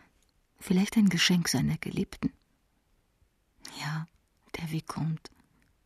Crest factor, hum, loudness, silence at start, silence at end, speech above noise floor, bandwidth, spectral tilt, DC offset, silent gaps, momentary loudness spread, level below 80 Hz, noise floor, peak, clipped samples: 20 dB; none; -29 LUFS; 0.6 s; 0.7 s; 42 dB; 14 kHz; -4.5 dB/octave; under 0.1%; none; 20 LU; -58 dBFS; -71 dBFS; -12 dBFS; under 0.1%